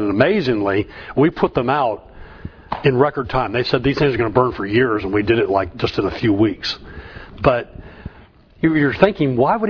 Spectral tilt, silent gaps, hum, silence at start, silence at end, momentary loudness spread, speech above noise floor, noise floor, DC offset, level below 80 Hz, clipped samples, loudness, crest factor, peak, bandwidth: -8 dB/octave; none; none; 0 s; 0 s; 20 LU; 29 dB; -46 dBFS; under 0.1%; -40 dBFS; under 0.1%; -18 LUFS; 18 dB; 0 dBFS; 5.4 kHz